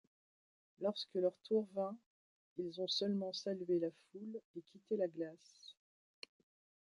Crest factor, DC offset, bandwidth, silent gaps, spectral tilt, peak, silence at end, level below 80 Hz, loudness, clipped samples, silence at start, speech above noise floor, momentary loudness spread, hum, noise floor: 18 dB; under 0.1%; 11 kHz; 2.06-2.56 s, 4.45-4.54 s; -5.5 dB/octave; -24 dBFS; 1.15 s; -90 dBFS; -41 LUFS; under 0.1%; 0.8 s; over 49 dB; 20 LU; none; under -90 dBFS